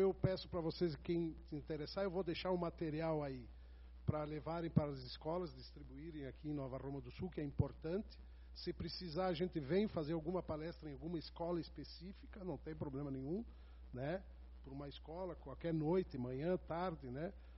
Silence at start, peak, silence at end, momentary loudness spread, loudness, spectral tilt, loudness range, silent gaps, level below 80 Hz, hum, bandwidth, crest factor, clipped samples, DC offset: 0 s; -20 dBFS; 0 s; 14 LU; -44 LUFS; -6.5 dB/octave; 5 LU; none; -58 dBFS; none; 5.8 kHz; 24 dB; under 0.1%; under 0.1%